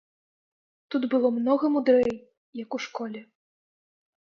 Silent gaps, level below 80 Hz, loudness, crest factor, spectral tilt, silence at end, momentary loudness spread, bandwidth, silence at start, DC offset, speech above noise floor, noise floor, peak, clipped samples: 2.37-2.53 s; -68 dBFS; -25 LUFS; 18 dB; -5.5 dB/octave; 1 s; 19 LU; 7 kHz; 0.9 s; under 0.1%; over 65 dB; under -90 dBFS; -10 dBFS; under 0.1%